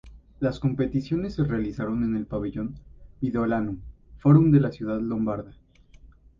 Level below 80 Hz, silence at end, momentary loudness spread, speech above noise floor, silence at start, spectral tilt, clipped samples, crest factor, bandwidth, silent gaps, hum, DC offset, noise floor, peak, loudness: -46 dBFS; 0.35 s; 14 LU; 28 dB; 0.05 s; -10 dB/octave; under 0.1%; 20 dB; 7 kHz; none; none; under 0.1%; -52 dBFS; -6 dBFS; -25 LUFS